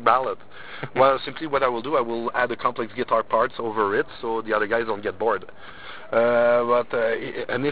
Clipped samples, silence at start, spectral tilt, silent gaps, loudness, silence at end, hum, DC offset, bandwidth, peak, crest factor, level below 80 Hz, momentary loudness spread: under 0.1%; 0 s; -9 dB/octave; none; -23 LUFS; 0 s; none; 1%; 4 kHz; -4 dBFS; 20 dB; -58 dBFS; 11 LU